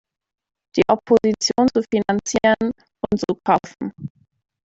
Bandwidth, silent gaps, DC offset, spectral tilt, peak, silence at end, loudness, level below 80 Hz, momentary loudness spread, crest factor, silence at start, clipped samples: 8 kHz; none; under 0.1%; -4.5 dB/octave; -2 dBFS; 0.55 s; -19 LUFS; -54 dBFS; 14 LU; 18 dB; 0.75 s; under 0.1%